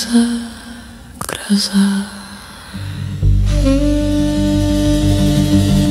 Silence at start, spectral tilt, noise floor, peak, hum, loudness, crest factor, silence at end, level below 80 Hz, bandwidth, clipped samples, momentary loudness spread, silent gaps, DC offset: 0 s; -6 dB/octave; -34 dBFS; 0 dBFS; none; -15 LUFS; 14 dB; 0 s; -22 dBFS; 16 kHz; under 0.1%; 18 LU; none; under 0.1%